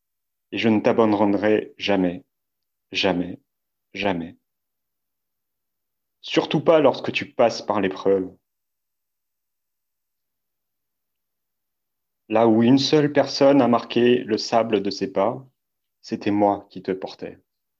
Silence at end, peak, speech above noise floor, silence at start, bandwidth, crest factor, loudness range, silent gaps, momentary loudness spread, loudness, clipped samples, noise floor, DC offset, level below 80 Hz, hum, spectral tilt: 0.5 s; -4 dBFS; 63 dB; 0.5 s; 7.6 kHz; 18 dB; 10 LU; none; 16 LU; -21 LUFS; under 0.1%; -83 dBFS; under 0.1%; -60 dBFS; none; -6 dB/octave